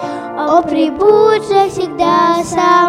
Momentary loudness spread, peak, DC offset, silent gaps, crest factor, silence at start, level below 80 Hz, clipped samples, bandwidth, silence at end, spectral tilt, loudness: 6 LU; 0 dBFS; under 0.1%; none; 12 dB; 0 s; -48 dBFS; under 0.1%; 13 kHz; 0 s; -5 dB/octave; -12 LUFS